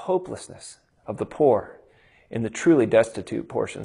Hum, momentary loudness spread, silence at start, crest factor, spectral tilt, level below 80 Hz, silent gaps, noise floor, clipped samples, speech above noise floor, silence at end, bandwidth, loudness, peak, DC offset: none; 23 LU; 0 s; 18 dB; -6 dB/octave; -60 dBFS; none; -57 dBFS; under 0.1%; 34 dB; 0 s; 11.5 kHz; -23 LUFS; -6 dBFS; under 0.1%